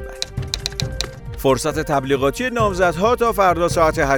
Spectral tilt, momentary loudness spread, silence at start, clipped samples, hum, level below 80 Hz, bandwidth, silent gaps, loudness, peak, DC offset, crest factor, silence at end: -4.5 dB/octave; 10 LU; 0 s; under 0.1%; none; -34 dBFS; over 20 kHz; none; -19 LUFS; 0 dBFS; under 0.1%; 18 dB; 0 s